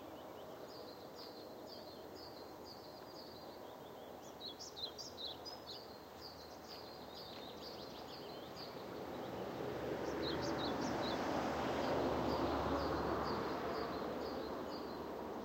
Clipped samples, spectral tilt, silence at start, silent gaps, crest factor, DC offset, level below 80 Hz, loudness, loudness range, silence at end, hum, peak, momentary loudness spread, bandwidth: under 0.1%; -5 dB/octave; 0 s; none; 18 dB; under 0.1%; -62 dBFS; -44 LUFS; 13 LU; 0 s; none; -26 dBFS; 14 LU; 16 kHz